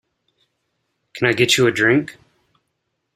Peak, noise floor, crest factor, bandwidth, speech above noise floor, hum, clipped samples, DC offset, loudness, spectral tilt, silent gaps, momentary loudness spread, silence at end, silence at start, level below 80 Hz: -2 dBFS; -74 dBFS; 20 dB; 15.5 kHz; 58 dB; none; under 0.1%; under 0.1%; -16 LUFS; -4 dB/octave; none; 18 LU; 1.05 s; 1.15 s; -58 dBFS